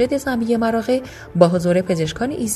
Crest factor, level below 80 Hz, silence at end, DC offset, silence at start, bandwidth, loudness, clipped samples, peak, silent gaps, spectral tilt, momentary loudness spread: 18 dB; -46 dBFS; 0 s; under 0.1%; 0 s; 13.5 kHz; -19 LUFS; under 0.1%; 0 dBFS; none; -5.5 dB/octave; 7 LU